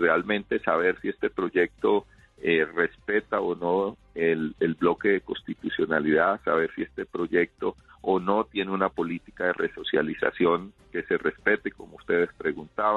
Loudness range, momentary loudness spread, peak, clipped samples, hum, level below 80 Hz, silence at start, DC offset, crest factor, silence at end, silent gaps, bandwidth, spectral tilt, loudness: 2 LU; 9 LU; -6 dBFS; under 0.1%; none; -58 dBFS; 0 s; under 0.1%; 20 dB; 0 s; none; 4.3 kHz; -7.5 dB/octave; -26 LUFS